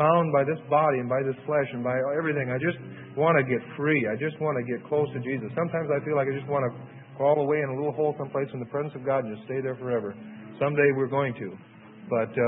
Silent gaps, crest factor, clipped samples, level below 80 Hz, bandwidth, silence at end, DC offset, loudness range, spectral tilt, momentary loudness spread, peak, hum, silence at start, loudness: none; 20 dB; under 0.1%; -70 dBFS; 3.9 kHz; 0 s; under 0.1%; 3 LU; -11.5 dB/octave; 9 LU; -8 dBFS; none; 0 s; -27 LUFS